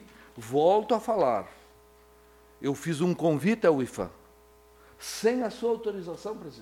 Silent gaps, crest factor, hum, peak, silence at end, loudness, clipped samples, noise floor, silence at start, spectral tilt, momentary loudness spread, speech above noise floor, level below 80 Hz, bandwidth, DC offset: none; 18 dB; 60 Hz at -55 dBFS; -12 dBFS; 0 s; -28 LUFS; under 0.1%; -57 dBFS; 0 s; -6 dB/octave; 14 LU; 30 dB; -62 dBFS; 17 kHz; under 0.1%